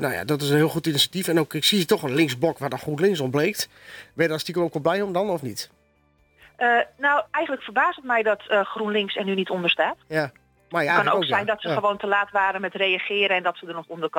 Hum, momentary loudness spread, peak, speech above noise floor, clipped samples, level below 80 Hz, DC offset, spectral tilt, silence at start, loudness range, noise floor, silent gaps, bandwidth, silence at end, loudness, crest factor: none; 9 LU; -6 dBFS; 39 dB; under 0.1%; -66 dBFS; under 0.1%; -4 dB/octave; 0 s; 3 LU; -63 dBFS; none; 19 kHz; 0 s; -23 LUFS; 18 dB